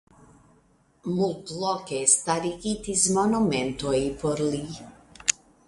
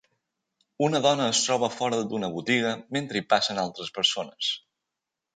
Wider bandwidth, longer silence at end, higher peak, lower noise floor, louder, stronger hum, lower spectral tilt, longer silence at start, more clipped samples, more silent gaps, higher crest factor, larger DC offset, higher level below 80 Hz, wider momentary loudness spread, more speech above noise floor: first, 11.5 kHz vs 9.6 kHz; second, 0.35 s vs 0.8 s; first, -2 dBFS vs -6 dBFS; second, -62 dBFS vs -86 dBFS; about the same, -25 LUFS vs -26 LUFS; neither; about the same, -3.5 dB/octave vs -3 dB/octave; first, 1.05 s vs 0.8 s; neither; neither; first, 26 dB vs 20 dB; neither; first, -52 dBFS vs -70 dBFS; first, 11 LU vs 7 LU; second, 36 dB vs 60 dB